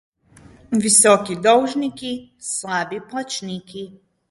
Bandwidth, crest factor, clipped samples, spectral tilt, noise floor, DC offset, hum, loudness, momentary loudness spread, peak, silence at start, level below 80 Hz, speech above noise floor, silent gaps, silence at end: 12 kHz; 20 dB; under 0.1%; -2.5 dB/octave; -48 dBFS; under 0.1%; none; -18 LUFS; 19 LU; 0 dBFS; 0.7 s; -60 dBFS; 29 dB; none; 0.4 s